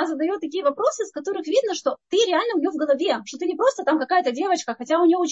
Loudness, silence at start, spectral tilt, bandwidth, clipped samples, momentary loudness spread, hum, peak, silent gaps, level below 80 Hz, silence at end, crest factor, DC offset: -22 LUFS; 0 s; -2.5 dB/octave; 8.2 kHz; under 0.1%; 6 LU; none; -6 dBFS; none; -76 dBFS; 0 s; 14 dB; under 0.1%